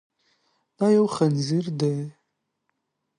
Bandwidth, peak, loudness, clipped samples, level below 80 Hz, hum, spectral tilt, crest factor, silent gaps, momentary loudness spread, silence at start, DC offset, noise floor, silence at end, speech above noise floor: 10.5 kHz; -8 dBFS; -23 LUFS; under 0.1%; -68 dBFS; none; -7 dB/octave; 16 dB; none; 9 LU; 0.8 s; under 0.1%; -77 dBFS; 1.1 s; 55 dB